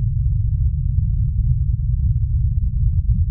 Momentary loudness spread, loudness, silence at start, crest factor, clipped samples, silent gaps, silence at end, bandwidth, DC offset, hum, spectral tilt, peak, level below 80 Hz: 1 LU; -20 LUFS; 0 s; 12 dB; under 0.1%; none; 0 s; 0.3 kHz; under 0.1%; none; -19.5 dB/octave; -6 dBFS; -20 dBFS